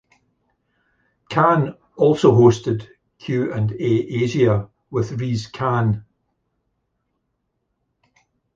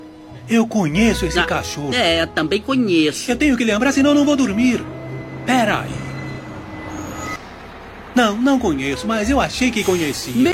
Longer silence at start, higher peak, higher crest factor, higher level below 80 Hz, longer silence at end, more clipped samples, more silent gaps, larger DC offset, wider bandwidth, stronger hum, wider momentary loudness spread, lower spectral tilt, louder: first, 1.3 s vs 0 s; about the same, -2 dBFS vs -2 dBFS; about the same, 18 dB vs 16 dB; second, -52 dBFS vs -38 dBFS; first, 2.55 s vs 0 s; neither; neither; neither; second, 7.6 kHz vs 16.5 kHz; neither; second, 12 LU vs 15 LU; first, -7.5 dB/octave vs -4.5 dB/octave; about the same, -19 LUFS vs -18 LUFS